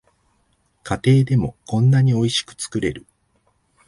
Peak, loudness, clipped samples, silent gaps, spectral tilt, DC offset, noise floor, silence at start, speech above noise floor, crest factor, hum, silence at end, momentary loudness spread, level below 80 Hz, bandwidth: -4 dBFS; -19 LUFS; under 0.1%; none; -6 dB/octave; under 0.1%; -64 dBFS; 0.85 s; 46 dB; 16 dB; none; 0.9 s; 12 LU; -48 dBFS; 11.5 kHz